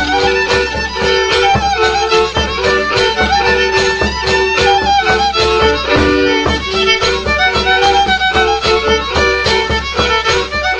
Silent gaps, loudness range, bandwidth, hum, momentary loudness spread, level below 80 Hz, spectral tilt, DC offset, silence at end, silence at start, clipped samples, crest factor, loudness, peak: none; 1 LU; 9.8 kHz; none; 3 LU; -26 dBFS; -3.5 dB/octave; under 0.1%; 0 s; 0 s; under 0.1%; 12 dB; -12 LUFS; 0 dBFS